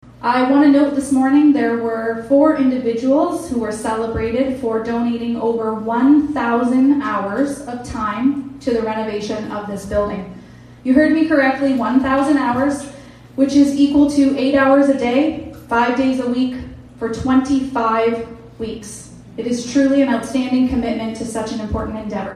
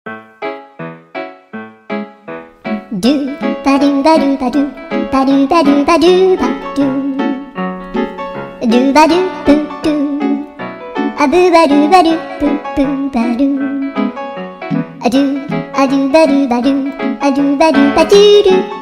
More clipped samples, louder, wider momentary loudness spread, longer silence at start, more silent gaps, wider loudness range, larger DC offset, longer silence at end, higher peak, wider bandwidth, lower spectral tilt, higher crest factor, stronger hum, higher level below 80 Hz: second, under 0.1% vs 0.4%; second, -17 LUFS vs -12 LUFS; second, 13 LU vs 16 LU; about the same, 0.05 s vs 0.05 s; neither; about the same, 5 LU vs 5 LU; neither; about the same, 0 s vs 0 s; about the same, -2 dBFS vs 0 dBFS; about the same, 11.5 kHz vs 12 kHz; about the same, -5.5 dB/octave vs -5.5 dB/octave; about the same, 16 dB vs 12 dB; neither; about the same, -42 dBFS vs -42 dBFS